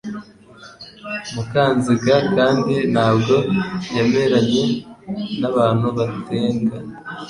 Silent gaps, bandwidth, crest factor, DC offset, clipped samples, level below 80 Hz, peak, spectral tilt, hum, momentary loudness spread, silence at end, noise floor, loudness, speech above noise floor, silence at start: none; 11 kHz; 16 dB; under 0.1%; under 0.1%; -52 dBFS; -4 dBFS; -6.5 dB/octave; none; 15 LU; 0 s; -43 dBFS; -18 LUFS; 25 dB; 0.05 s